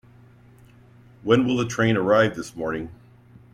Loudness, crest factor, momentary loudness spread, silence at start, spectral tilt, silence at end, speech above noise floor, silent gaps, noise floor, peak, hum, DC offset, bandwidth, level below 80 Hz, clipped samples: -22 LUFS; 20 dB; 14 LU; 1.25 s; -6 dB/octave; 0.6 s; 30 dB; none; -51 dBFS; -4 dBFS; none; under 0.1%; 14.5 kHz; -56 dBFS; under 0.1%